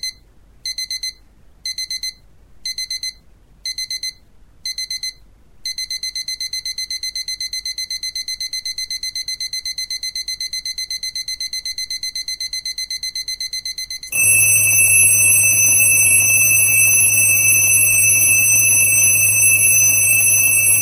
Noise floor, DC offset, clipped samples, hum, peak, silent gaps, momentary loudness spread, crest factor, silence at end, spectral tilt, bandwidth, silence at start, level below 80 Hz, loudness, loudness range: -48 dBFS; 0.2%; under 0.1%; none; -2 dBFS; none; 15 LU; 16 dB; 0 s; 1 dB/octave; 16 kHz; 0.05 s; -50 dBFS; -14 LUFS; 16 LU